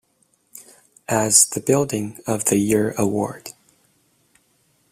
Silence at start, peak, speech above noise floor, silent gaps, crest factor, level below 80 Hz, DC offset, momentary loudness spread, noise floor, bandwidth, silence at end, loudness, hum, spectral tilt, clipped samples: 0.55 s; 0 dBFS; 45 dB; none; 22 dB; -58 dBFS; under 0.1%; 17 LU; -64 dBFS; 16 kHz; 1.4 s; -19 LUFS; none; -3.5 dB/octave; under 0.1%